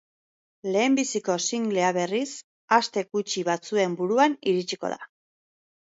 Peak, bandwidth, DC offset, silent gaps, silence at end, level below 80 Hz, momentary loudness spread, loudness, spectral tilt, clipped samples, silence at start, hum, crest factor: -4 dBFS; 8 kHz; under 0.1%; 2.44-2.68 s; 0.85 s; -76 dBFS; 10 LU; -25 LUFS; -3.5 dB/octave; under 0.1%; 0.65 s; none; 22 dB